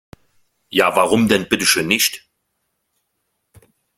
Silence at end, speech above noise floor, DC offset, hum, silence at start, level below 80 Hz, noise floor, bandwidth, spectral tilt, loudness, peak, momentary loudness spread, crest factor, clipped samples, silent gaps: 1.8 s; 56 dB; under 0.1%; none; 0.7 s; -54 dBFS; -72 dBFS; 16.5 kHz; -3 dB/octave; -16 LUFS; 0 dBFS; 5 LU; 20 dB; under 0.1%; none